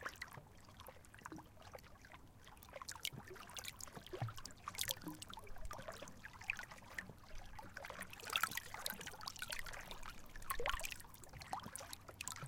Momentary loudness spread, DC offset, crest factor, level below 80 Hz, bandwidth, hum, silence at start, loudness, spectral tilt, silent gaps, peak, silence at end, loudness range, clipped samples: 16 LU; under 0.1%; 32 dB; -58 dBFS; 17 kHz; none; 0 s; -48 LUFS; -2 dB/octave; none; -16 dBFS; 0 s; 7 LU; under 0.1%